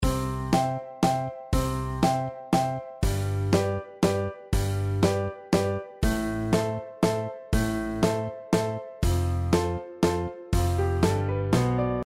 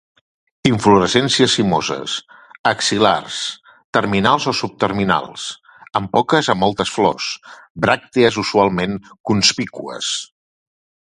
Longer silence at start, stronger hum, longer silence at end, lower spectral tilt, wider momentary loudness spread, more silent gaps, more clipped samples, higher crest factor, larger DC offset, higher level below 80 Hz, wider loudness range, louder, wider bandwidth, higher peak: second, 0 s vs 0.65 s; neither; second, 0 s vs 0.8 s; first, -6.5 dB/octave vs -4 dB/octave; second, 5 LU vs 12 LU; second, none vs 2.59-2.64 s, 3.84-3.93 s, 7.70-7.75 s, 9.20-9.24 s; neither; about the same, 16 dB vs 18 dB; neither; first, -36 dBFS vs -50 dBFS; about the same, 1 LU vs 3 LU; second, -27 LUFS vs -17 LUFS; first, 16 kHz vs 11.5 kHz; second, -10 dBFS vs 0 dBFS